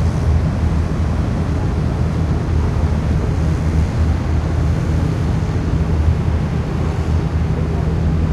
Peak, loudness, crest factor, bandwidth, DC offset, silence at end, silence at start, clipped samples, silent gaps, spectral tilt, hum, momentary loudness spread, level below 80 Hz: -2 dBFS; -18 LUFS; 14 dB; 9.4 kHz; under 0.1%; 0 s; 0 s; under 0.1%; none; -8 dB/octave; none; 2 LU; -22 dBFS